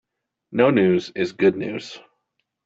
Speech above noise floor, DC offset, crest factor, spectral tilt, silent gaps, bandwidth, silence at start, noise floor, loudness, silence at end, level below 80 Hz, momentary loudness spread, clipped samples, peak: 55 dB; under 0.1%; 20 dB; -7 dB/octave; none; 7.8 kHz; 0.5 s; -75 dBFS; -20 LUFS; 0.65 s; -62 dBFS; 14 LU; under 0.1%; -2 dBFS